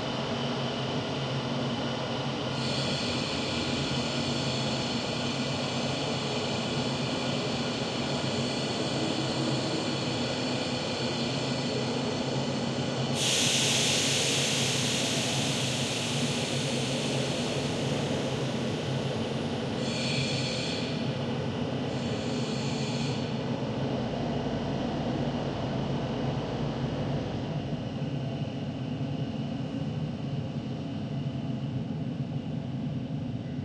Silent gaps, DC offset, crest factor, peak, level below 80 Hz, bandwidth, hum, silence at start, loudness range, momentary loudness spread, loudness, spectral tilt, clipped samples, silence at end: none; under 0.1%; 18 dB; -12 dBFS; -54 dBFS; 13.5 kHz; none; 0 s; 8 LU; 7 LU; -30 LUFS; -4 dB/octave; under 0.1%; 0 s